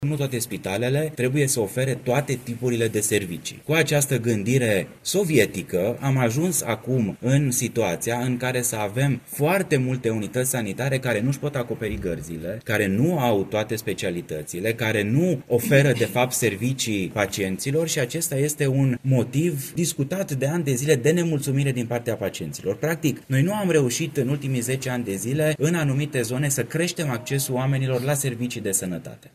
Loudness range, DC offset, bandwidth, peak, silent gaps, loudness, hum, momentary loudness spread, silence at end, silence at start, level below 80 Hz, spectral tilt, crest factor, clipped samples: 2 LU; under 0.1%; 15 kHz; -4 dBFS; none; -23 LUFS; none; 6 LU; 0.05 s; 0 s; -54 dBFS; -5 dB/octave; 20 dB; under 0.1%